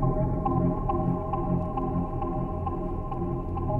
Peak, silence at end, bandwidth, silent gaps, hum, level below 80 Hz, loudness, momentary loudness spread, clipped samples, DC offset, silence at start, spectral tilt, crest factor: -14 dBFS; 0 s; 3.1 kHz; none; none; -34 dBFS; -29 LUFS; 5 LU; under 0.1%; under 0.1%; 0 s; -12 dB/octave; 14 dB